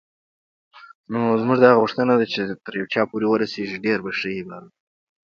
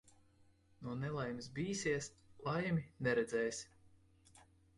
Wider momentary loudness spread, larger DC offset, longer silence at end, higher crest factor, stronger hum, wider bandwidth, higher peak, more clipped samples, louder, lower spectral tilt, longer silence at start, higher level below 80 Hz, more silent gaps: about the same, 14 LU vs 12 LU; neither; first, 0.6 s vs 0.35 s; about the same, 22 dB vs 18 dB; neither; second, 7 kHz vs 11.5 kHz; first, 0 dBFS vs -24 dBFS; neither; first, -20 LUFS vs -40 LUFS; first, -7 dB/octave vs -5 dB/octave; about the same, 0.75 s vs 0.8 s; about the same, -64 dBFS vs -68 dBFS; first, 0.95-1.04 s vs none